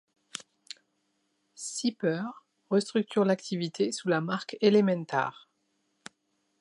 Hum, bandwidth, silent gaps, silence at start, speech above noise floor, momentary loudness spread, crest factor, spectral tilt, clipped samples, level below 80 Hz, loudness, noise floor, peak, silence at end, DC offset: none; 11.5 kHz; none; 0.35 s; 48 dB; 18 LU; 22 dB; -5 dB/octave; under 0.1%; -82 dBFS; -29 LUFS; -76 dBFS; -10 dBFS; 1.3 s; under 0.1%